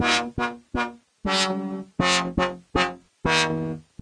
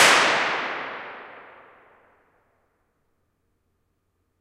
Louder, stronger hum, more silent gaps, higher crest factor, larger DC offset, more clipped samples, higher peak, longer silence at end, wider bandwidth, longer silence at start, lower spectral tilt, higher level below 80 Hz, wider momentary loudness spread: second, -25 LUFS vs -21 LUFS; neither; neither; about the same, 20 dB vs 24 dB; neither; neither; about the same, -6 dBFS vs -4 dBFS; second, 0.2 s vs 3 s; second, 11 kHz vs 16 kHz; about the same, 0 s vs 0 s; first, -3.5 dB/octave vs -0.5 dB/octave; first, -44 dBFS vs -70 dBFS; second, 9 LU vs 26 LU